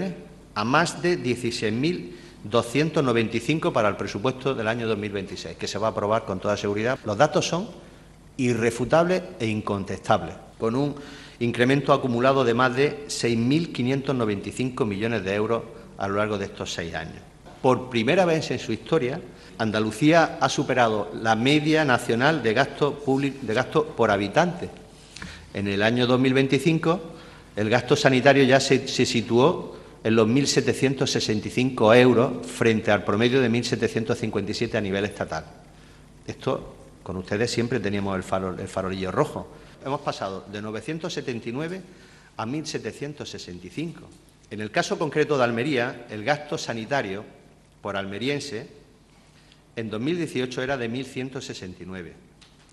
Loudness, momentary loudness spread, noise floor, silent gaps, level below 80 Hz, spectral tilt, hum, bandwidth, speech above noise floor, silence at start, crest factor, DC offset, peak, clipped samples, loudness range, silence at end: -24 LUFS; 15 LU; -54 dBFS; none; -54 dBFS; -5.5 dB/octave; none; 12.5 kHz; 30 dB; 0 s; 24 dB; under 0.1%; 0 dBFS; under 0.1%; 10 LU; 0.6 s